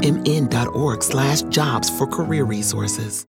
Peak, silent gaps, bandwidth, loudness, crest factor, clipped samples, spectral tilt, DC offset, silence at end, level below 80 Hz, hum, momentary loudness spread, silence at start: -4 dBFS; none; 17 kHz; -20 LUFS; 16 dB; under 0.1%; -4.5 dB/octave; under 0.1%; 0.05 s; -48 dBFS; none; 3 LU; 0 s